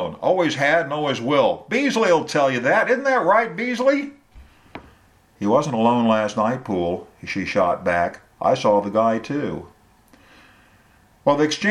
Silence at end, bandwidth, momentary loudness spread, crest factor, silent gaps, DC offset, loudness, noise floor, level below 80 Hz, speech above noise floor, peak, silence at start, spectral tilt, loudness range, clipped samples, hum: 0 s; 11.5 kHz; 9 LU; 18 dB; none; under 0.1%; -20 LUFS; -55 dBFS; -56 dBFS; 35 dB; -4 dBFS; 0 s; -5 dB/octave; 4 LU; under 0.1%; none